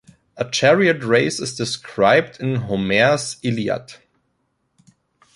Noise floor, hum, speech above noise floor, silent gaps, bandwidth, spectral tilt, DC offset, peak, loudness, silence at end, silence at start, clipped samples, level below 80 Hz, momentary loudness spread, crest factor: -69 dBFS; none; 51 dB; none; 11.5 kHz; -4.5 dB/octave; under 0.1%; -2 dBFS; -19 LUFS; 1.4 s; 0.35 s; under 0.1%; -56 dBFS; 10 LU; 18 dB